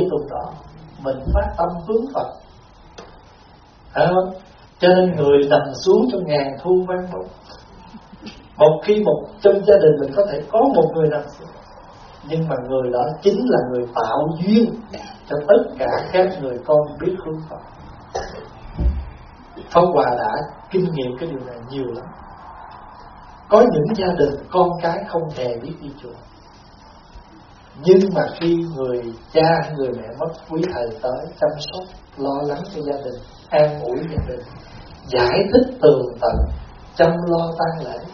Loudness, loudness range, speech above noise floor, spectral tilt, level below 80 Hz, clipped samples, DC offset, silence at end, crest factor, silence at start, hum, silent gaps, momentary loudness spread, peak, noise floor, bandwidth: -19 LUFS; 7 LU; 28 dB; -5.5 dB/octave; -36 dBFS; under 0.1%; under 0.1%; 0 s; 20 dB; 0 s; none; none; 21 LU; 0 dBFS; -47 dBFS; 6.6 kHz